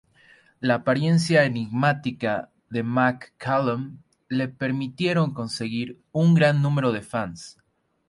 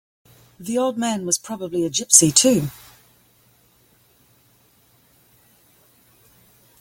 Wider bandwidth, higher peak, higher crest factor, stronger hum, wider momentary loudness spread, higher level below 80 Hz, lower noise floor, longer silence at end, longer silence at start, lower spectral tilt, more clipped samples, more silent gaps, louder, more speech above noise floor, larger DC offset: second, 11.5 kHz vs 17 kHz; second, -6 dBFS vs 0 dBFS; second, 18 dB vs 24 dB; neither; second, 12 LU vs 15 LU; about the same, -62 dBFS vs -60 dBFS; about the same, -56 dBFS vs -58 dBFS; second, 0.6 s vs 4.1 s; about the same, 0.6 s vs 0.6 s; first, -6.5 dB/octave vs -3 dB/octave; neither; neither; second, -24 LUFS vs -17 LUFS; second, 33 dB vs 39 dB; neither